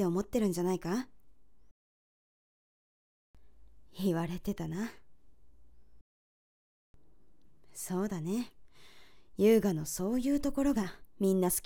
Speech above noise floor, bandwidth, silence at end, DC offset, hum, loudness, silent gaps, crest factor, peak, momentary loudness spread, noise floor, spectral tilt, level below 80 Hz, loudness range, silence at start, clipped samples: 36 dB; 17.5 kHz; 0.05 s; 0.2%; none; -32 LUFS; 1.71-3.34 s, 6.01-6.94 s; 20 dB; -14 dBFS; 14 LU; -67 dBFS; -6 dB/octave; -56 dBFS; 13 LU; 0 s; under 0.1%